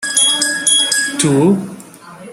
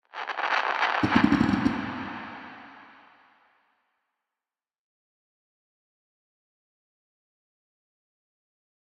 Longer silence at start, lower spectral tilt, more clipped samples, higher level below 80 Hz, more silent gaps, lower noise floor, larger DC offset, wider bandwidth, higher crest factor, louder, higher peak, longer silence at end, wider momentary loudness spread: second, 0 s vs 0.15 s; second, -2.5 dB/octave vs -6 dB/octave; neither; about the same, -56 dBFS vs -56 dBFS; neither; second, -36 dBFS vs under -90 dBFS; neither; first, 16.5 kHz vs 9.2 kHz; second, 14 dB vs 26 dB; first, -12 LUFS vs -25 LUFS; first, 0 dBFS vs -6 dBFS; second, 0 s vs 6 s; second, 6 LU vs 20 LU